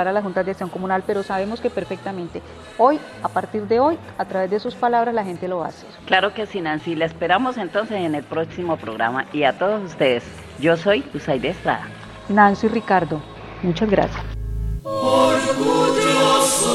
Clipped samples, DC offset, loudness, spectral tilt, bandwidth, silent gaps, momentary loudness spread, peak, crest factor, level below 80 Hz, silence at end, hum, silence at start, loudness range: under 0.1%; under 0.1%; -20 LUFS; -4 dB/octave; 15.5 kHz; none; 12 LU; 0 dBFS; 20 dB; -40 dBFS; 0 s; none; 0 s; 3 LU